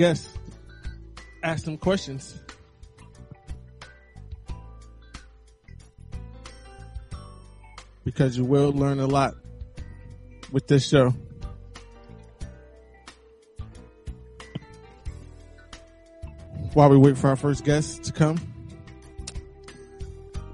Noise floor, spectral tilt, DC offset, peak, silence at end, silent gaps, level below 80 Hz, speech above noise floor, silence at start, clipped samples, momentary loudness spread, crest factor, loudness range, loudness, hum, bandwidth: -53 dBFS; -7 dB/octave; under 0.1%; -2 dBFS; 0 s; none; -44 dBFS; 32 dB; 0 s; under 0.1%; 26 LU; 24 dB; 23 LU; -22 LUFS; none; 10.5 kHz